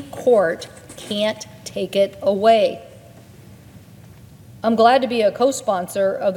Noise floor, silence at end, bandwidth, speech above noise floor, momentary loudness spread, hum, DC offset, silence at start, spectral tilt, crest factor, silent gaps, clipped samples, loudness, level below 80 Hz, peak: -43 dBFS; 0 s; 17.5 kHz; 26 dB; 16 LU; none; under 0.1%; 0 s; -4.5 dB/octave; 18 dB; none; under 0.1%; -18 LUFS; -60 dBFS; -2 dBFS